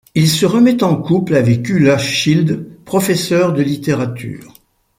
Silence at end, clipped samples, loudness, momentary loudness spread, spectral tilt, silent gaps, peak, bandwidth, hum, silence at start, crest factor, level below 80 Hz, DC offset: 0.55 s; under 0.1%; -14 LUFS; 10 LU; -5.5 dB/octave; none; -2 dBFS; 16 kHz; none; 0.15 s; 12 dB; -50 dBFS; under 0.1%